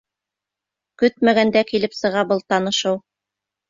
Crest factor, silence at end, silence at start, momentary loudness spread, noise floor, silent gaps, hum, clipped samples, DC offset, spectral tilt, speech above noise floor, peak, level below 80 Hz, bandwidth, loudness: 18 dB; 0.7 s; 1 s; 6 LU; -86 dBFS; none; 50 Hz at -50 dBFS; under 0.1%; under 0.1%; -4.5 dB/octave; 67 dB; -4 dBFS; -62 dBFS; 7.6 kHz; -19 LUFS